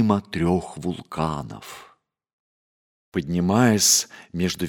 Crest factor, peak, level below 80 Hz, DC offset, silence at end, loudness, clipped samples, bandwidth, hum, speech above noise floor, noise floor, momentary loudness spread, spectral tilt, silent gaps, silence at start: 20 dB; -4 dBFS; -50 dBFS; under 0.1%; 0 s; -22 LUFS; under 0.1%; over 20 kHz; none; over 68 dB; under -90 dBFS; 16 LU; -4 dB/octave; 2.33-3.12 s; 0 s